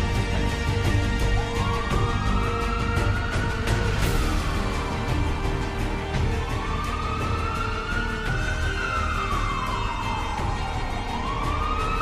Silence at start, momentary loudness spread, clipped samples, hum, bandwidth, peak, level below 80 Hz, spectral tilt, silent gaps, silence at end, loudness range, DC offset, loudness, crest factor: 0 s; 4 LU; under 0.1%; none; 15.5 kHz; -10 dBFS; -28 dBFS; -5.5 dB/octave; none; 0 s; 2 LU; under 0.1%; -26 LUFS; 14 dB